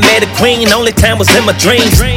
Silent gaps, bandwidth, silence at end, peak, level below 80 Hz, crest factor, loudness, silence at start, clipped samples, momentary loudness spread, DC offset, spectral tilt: none; over 20 kHz; 0 s; 0 dBFS; -20 dBFS; 8 dB; -8 LUFS; 0 s; 1%; 2 LU; under 0.1%; -3.5 dB/octave